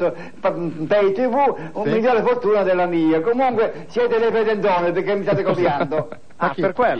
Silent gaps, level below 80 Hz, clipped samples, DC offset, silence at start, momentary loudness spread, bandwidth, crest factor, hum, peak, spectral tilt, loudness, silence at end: none; -58 dBFS; under 0.1%; 1%; 0 s; 7 LU; 6.8 kHz; 12 dB; none; -6 dBFS; -7.5 dB/octave; -19 LUFS; 0 s